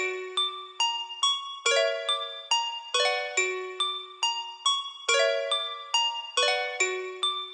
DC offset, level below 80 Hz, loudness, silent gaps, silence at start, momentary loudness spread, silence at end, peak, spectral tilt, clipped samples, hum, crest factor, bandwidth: under 0.1%; under -90 dBFS; -27 LUFS; none; 0 s; 5 LU; 0 s; -10 dBFS; 3.5 dB/octave; under 0.1%; none; 18 dB; 11.5 kHz